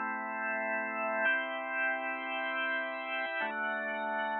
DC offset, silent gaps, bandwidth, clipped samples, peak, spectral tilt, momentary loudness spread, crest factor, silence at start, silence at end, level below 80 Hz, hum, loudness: under 0.1%; none; 4.2 kHz; under 0.1%; -18 dBFS; -6 dB/octave; 5 LU; 16 dB; 0 s; 0 s; -88 dBFS; none; -33 LUFS